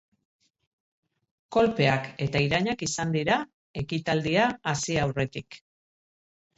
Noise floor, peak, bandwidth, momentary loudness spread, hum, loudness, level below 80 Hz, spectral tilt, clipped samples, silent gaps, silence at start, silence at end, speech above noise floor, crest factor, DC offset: under -90 dBFS; -10 dBFS; 8.2 kHz; 9 LU; none; -26 LUFS; -54 dBFS; -5 dB/octave; under 0.1%; 3.54-3.74 s; 1.5 s; 1 s; over 64 dB; 18 dB; under 0.1%